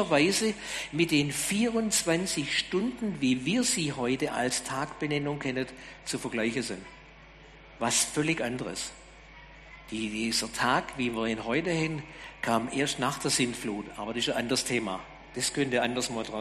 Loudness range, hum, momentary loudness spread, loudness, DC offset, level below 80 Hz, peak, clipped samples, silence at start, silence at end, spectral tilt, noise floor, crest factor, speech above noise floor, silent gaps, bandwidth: 5 LU; none; 11 LU; -29 LUFS; under 0.1%; -56 dBFS; -12 dBFS; under 0.1%; 0 s; 0 s; -3.5 dB/octave; -51 dBFS; 18 dB; 22 dB; none; 13 kHz